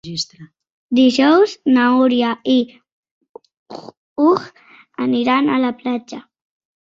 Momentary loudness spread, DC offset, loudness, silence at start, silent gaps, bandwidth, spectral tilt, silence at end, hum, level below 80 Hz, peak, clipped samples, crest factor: 23 LU; under 0.1%; -16 LUFS; 0.05 s; 0.72-0.89 s, 2.92-3.03 s, 3.11-3.21 s, 3.29-3.35 s, 3.57-3.66 s, 3.97-4.16 s; 7.6 kHz; -4.5 dB/octave; 0.65 s; none; -64 dBFS; -2 dBFS; under 0.1%; 16 dB